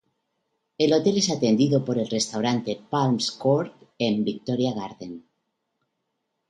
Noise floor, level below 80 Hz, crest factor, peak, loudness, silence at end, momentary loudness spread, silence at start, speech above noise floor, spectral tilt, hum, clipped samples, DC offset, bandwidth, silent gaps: -78 dBFS; -66 dBFS; 18 dB; -8 dBFS; -24 LUFS; 1.3 s; 14 LU; 0.8 s; 55 dB; -5 dB/octave; none; under 0.1%; under 0.1%; 11.5 kHz; none